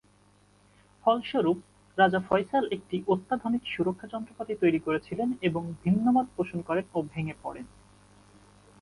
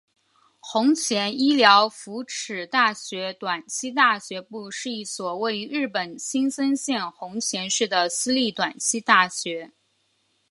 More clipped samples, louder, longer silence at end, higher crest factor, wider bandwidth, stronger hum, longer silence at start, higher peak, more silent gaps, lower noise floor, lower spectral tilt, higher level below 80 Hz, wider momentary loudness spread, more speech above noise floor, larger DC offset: neither; second, -28 LUFS vs -23 LUFS; first, 1.15 s vs 0.85 s; about the same, 20 dB vs 24 dB; about the same, 11.5 kHz vs 11.5 kHz; first, 50 Hz at -55 dBFS vs none; first, 1.05 s vs 0.65 s; second, -10 dBFS vs 0 dBFS; neither; second, -62 dBFS vs -69 dBFS; first, -7.5 dB/octave vs -2 dB/octave; first, -62 dBFS vs -76 dBFS; about the same, 13 LU vs 13 LU; second, 34 dB vs 45 dB; neither